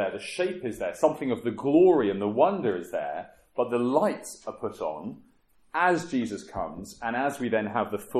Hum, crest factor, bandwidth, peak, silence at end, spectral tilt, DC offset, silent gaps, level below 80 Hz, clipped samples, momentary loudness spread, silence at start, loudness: none; 20 dB; 14 kHz; -8 dBFS; 0 s; -6 dB/octave; under 0.1%; none; -60 dBFS; under 0.1%; 13 LU; 0 s; -27 LUFS